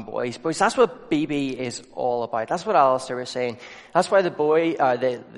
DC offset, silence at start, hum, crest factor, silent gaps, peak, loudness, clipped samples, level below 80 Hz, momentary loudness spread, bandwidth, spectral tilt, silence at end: under 0.1%; 0 s; none; 18 dB; none; -4 dBFS; -23 LUFS; under 0.1%; -62 dBFS; 10 LU; 11.5 kHz; -5 dB/octave; 0 s